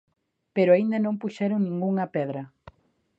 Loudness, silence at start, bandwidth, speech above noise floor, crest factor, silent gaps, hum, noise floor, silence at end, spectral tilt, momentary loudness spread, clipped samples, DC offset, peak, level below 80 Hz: -25 LUFS; 0.55 s; 7.8 kHz; 33 dB; 18 dB; none; none; -57 dBFS; 0.7 s; -9 dB/octave; 12 LU; under 0.1%; under 0.1%; -8 dBFS; -68 dBFS